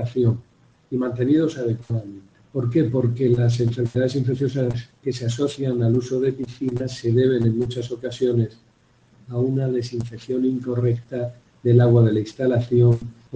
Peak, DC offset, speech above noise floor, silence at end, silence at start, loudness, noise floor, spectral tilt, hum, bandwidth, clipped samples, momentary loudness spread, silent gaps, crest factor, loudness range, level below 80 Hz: -2 dBFS; under 0.1%; 37 dB; 0 s; 0 s; -22 LUFS; -57 dBFS; -8.5 dB/octave; none; 8 kHz; under 0.1%; 11 LU; none; 18 dB; 4 LU; -54 dBFS